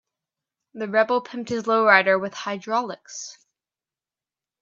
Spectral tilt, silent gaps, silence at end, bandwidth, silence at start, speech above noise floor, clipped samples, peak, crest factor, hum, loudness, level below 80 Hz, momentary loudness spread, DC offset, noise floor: -3.5 dB/octave; none; 1.3 s; 7.8 kHz; 0.75 s; over 68 dB; under 0.1%; 0 dBFS; 24 dB; none; -21 LUFS; -72 dBFS; 19 LU; under 0.1%; under -90 dBFS